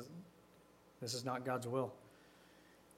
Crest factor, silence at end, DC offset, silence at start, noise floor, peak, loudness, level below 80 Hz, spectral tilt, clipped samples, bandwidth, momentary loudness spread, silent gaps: 20 dB; 0.05 s; under 0.1%; 0 s; -66 dBFS; -26 dBFS; -42 LUFS; -82 dBFS; -4.5 dB/octave; under 0.1%; 16 kHz; 24 LU; none